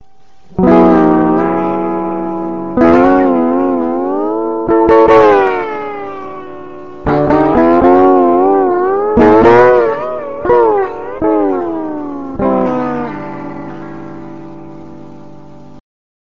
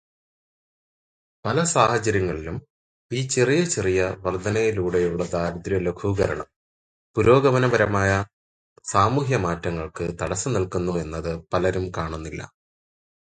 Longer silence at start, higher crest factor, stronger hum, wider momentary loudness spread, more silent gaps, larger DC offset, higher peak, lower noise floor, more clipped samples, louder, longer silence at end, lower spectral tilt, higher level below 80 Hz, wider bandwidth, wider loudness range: second, 0.55 s vs 1.45 s; second, 12 dB vs 22 dB; neither; first, 20 LU vs 13 LU; second, none vs 2.70-3.09 s, 6.56-7.14 s, 8.33-8.76 s; first, 2% vs under 0.1%; about the same, 0 dBFS vs -2 dBFS; second, -48 dBFS vs under -90 dBFS; first, 0.1% vs under 0.1%; first, -11 LUFS vs -23 LUFS; second, 0.5 s vs 0.75 s; first, -8.5 dB/octave vs -5.5 dB/octave; first, -38 dBFS vs -44 dBFS; second, 7 kHz vs 9.6 kHz; first, 11 LU vs 4 LU